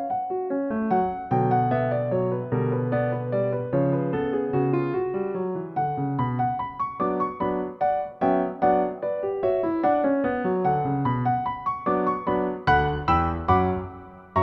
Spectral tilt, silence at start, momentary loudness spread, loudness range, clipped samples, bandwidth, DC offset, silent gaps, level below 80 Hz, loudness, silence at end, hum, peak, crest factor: -10 dB/octave; 0 s; 6 LU; 2 LU; under 0.1%; 6 kHz; under 0.1%; none; -46 dBFS; -25 LUFS; 0 s; none; -6 dBFS; 18 dB